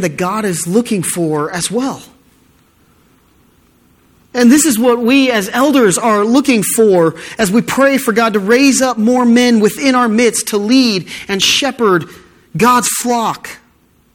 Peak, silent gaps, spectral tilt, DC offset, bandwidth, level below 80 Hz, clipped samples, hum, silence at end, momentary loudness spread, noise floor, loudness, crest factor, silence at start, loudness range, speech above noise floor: 0 dBFS; none; -3.5 dB/octave; under 0.1%; 18 kHz; -52 dBFS; under 0.1%; none; 0.6 s; 8 LU; -52 dBFS; -12 LUFS; 12 dB; 0 s; 8 LU; 40 dB